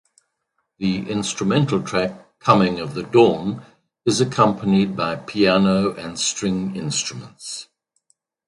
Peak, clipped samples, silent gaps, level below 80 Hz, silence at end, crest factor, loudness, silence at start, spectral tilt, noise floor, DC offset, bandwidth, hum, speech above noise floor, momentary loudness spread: 0 dBFS; under 0.1%; none; -54 dBFS; 0.85 s; 20 dB; -20 LUFS; 0.8 s; -5 dB/octave; -74 dBFS; under 0.1%; 11.5 kHz; none; 54 dB; 13 LU